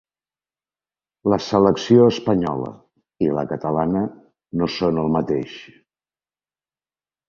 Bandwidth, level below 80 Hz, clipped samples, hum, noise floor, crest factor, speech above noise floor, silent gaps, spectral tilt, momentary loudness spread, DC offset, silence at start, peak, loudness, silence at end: 7.4 kHz; -52 dBFS; under 0.1%; none; under -90 dBFS; 20 dB; over 71 dB; none; -7 dB/octave; 14 LU; under 0.1%; 1.25 s; -2 dBFS; -20 LUFS; 1.65 s